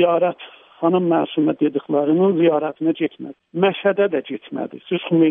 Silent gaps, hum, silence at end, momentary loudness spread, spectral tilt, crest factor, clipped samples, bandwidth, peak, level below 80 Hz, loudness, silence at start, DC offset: none; none; 0 s; 12 LU; -10.5 dB/octave; 14 dB; under 0.1%; 3.8 kHz; -4 dBFS; -72 dBFS; -20 LUFS; 0 s; under 0.1%